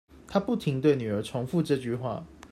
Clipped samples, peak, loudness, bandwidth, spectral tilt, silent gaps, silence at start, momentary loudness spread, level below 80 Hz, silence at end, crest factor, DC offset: under 0.1%; -12 dBFS; -28 LUFS; 14 kHz; -7.5 dB/octave; none; 0.15 s; 8 LU; -58 dBFS; 0.05 s; 18 dB; under 0.1%